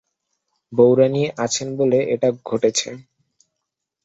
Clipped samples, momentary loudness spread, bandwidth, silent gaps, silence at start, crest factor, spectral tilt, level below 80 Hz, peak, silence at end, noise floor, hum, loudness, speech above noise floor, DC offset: under 0.1%; 9 LU; 8 kHz; none; 0.7 s; 18 dB; -4.5 dB/octave; -62 dBFS; -2 dBFS; 1.05 s; -80 dBFS; none; -19 LUFS; 62 dB; under 0.1%